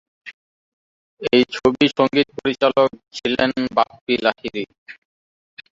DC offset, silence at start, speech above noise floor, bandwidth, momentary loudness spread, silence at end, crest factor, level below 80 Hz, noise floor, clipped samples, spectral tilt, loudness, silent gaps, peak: under 0.1%; 0.25 s; over 71 dB; 7.8 kHz; 13 LU; 0.85 s; 18 dB; -56 dBFS; under -90 dBFS; under 0.1%; -5.5 dB/octave; -19 LUFS; 0.34-1.17 s, 4.01-4.07 s, 4.78-4.86 s; -2 dBFS